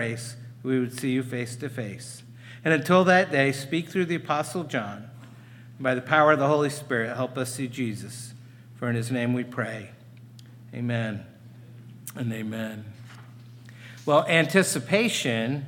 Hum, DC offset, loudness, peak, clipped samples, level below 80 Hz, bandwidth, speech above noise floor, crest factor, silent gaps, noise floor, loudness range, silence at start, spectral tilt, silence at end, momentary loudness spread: none; under 0.1%; -25 LUFS; -4 dBFS; under 0.1%; -72 dBFS; 18.5 kHz; 22 dB; 22 dB; none; -47 dBFS; 10 LU; 0 s; -5 dB/octave; 0 s; 22 LU